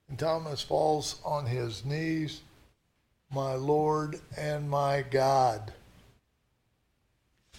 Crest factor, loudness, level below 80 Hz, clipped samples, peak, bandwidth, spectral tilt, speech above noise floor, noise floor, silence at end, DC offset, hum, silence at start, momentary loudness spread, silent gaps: 18 dB; -30 LUFS; -60 dBFS; under 0.1%; -14 dBFS; 16.5 kHz; -5.5 dB/octave; 45 dB; -74 dBFS; 0 s; under 0.1%; none; 0.1 s; 11 LU; none